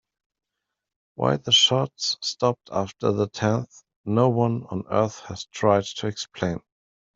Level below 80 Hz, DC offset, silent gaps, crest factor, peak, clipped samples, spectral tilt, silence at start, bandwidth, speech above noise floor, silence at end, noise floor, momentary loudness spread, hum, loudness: -62 dBFS; under 0.1%; 3.96-4.04 s; 20 dB; -4 dBFS; under 0.1%; -4.5 dB/octave; 1.2 s; 8 kHz; 60 dB; 0.55 s; -84 dBFS; 12 LU; none; -23 LUFS